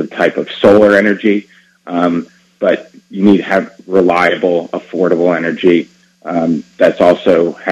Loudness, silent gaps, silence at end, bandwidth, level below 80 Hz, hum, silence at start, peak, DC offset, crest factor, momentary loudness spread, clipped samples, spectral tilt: -12 LUFS; none; 0 s; 11 kHz; -52 dBFS; none; 0 s; 0 dBFS; under 0.1%; 12 dB; 10 LU; 0.5%; -7 dB/octave